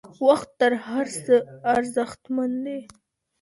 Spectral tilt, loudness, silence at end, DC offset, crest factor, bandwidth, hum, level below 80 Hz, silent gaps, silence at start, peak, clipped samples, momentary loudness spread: -4.5 dB/octave; -24 LUFS; 0.6 s; under 0.1%; 18 dB; 11.5 kHz; none; -64 dBFS; none; 0.05 s; -6 dBFS; under 0.1%; 8 LU